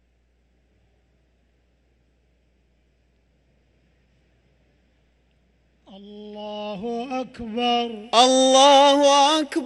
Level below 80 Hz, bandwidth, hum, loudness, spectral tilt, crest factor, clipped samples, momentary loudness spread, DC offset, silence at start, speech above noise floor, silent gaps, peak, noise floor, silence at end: -62 dBFS; 11.5 kHz; none; -18 LUFS; -2 dB/octave; 20 dB; under 0.1%; 21 LU; under 0.1%; 5.95 s; 46 dB; none; -2 dBFS; -64 dBFS; 0 s